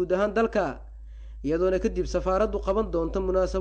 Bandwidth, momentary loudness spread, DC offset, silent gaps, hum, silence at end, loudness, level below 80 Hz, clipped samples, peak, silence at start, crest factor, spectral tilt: 8.8 kHz; 17 LU; under 0.1%; none; none; 0 s; -26 LUFS; -36 dBFS; under 0.1%; -12 dBFS; 0 s; 12 dB; -6.5 dB/octave